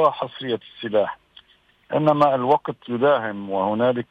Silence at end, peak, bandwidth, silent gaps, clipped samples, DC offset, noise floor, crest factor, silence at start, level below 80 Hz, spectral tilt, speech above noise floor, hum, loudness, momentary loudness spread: 0.05 s; -6 dBFS; 6.2 kHz; none; under 0.1%; under 0.1%; -59 dBFS; 16 dB; 0 s; -66 dBFS; -8 dB/octave; 38 dB; none; -22 LUFS; 11 LU